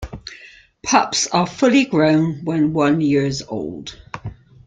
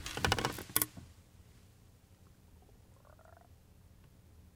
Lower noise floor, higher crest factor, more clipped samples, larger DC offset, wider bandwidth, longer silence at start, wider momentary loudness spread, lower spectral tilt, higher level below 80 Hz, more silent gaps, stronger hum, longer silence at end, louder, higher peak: second, -45 dBFS vs -62 dBFS; second, 18 dB vs 36 dB; neither; neither; second, 9.4 kHz vs 18 kHz; about the same, 0 s vs 0 s; second, 18 LU vs 27 LU; first, -4.5 dB/octave vs -2.5 dB/octave; first, -46 dBFS vs -58 dBFS; neither; neither; first, 0.35 s vs 0.1 s; first, -17 LUFS vs -34 LUFS; first, 0 dBFS vs -6 dBFS